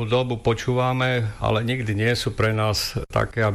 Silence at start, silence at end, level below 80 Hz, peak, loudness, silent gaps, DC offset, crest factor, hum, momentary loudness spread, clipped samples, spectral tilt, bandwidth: 0 s; 0 s; -40 dBFS; -10 dBFS; -23 LUFS; none; under 0.1%; 12 dB; none; 3 LU; under 0.1%; -5.5 dB/octave; 15 kHz